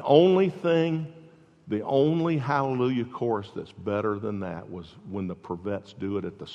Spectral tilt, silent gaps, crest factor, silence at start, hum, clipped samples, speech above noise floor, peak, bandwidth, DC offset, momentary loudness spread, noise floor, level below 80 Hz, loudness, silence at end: -8.5 dB/octave; none; 20 dB; 0 s; none; under 0.1%; 27 dB; -6 dBFS; 7.6 kHz; under 0.1%; 13 LU; -53 dBFS; -66 dBFS; -27 LUFS; 0 s